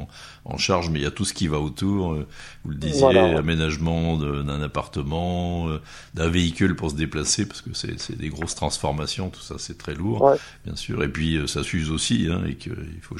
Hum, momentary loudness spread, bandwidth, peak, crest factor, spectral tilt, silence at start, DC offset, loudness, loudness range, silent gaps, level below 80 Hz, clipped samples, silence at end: none; 14 LU; 12.5 kHz; -2 dBFS; 22 dB; -5 dB/octave; 0 s; under 0.1%; -24 LUFS; 3 LU; none; -38 dBFS; under 0.1%; 0 s